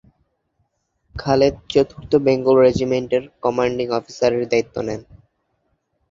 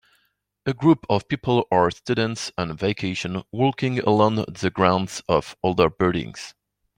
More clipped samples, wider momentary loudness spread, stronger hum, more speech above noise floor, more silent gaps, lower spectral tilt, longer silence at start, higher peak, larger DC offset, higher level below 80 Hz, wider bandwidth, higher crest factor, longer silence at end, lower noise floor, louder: neither; about the same, 12 LU vs 10 LU; neither; about the same, 51 dB vs 48 dB; neither; about the same, -6 dB/octave vs -6 dB/octave; first, 1.15 s vs 0.65 s; about the same, -2 dBFS vs -4 dBFS; neither; first, -46 dBFS vs -52 dBFS; second, 7.6 kHz vs 15.5 kHz; about the same, 18 dB vs 20 dB; first, 1.1 s vs 0.45 s; about the same, -69 dBFS vs -70 dBFS; first, -19 LUFS vs -22 LUFS